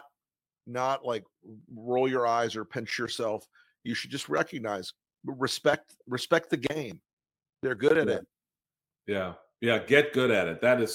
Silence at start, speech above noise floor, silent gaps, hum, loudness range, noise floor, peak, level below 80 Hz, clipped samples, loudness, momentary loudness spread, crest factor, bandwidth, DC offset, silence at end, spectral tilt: 0.65 s; over 62 dB; 7.13-7.17 s; none; 4 LU; under -90 dBFS; -6 dBFS; -70 dBFS; under 0.1%; -29 LUFS; 14 LU; 24 dB; 16.5 kHz; under 0.1%; 0 s; -4.5 dB/octave